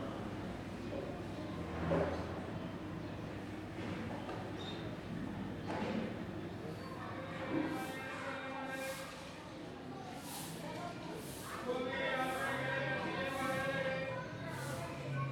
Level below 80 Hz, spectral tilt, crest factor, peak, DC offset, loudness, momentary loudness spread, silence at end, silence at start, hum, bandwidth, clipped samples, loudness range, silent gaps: -60 dBFS; -5.5 dB/octave; 20 dB; -22 dBFS; under 0.1%; -41 LUFS; 9 LU; 0 s; 0 s; none; 19.5 kHz; under 0.1%; 6 LU; none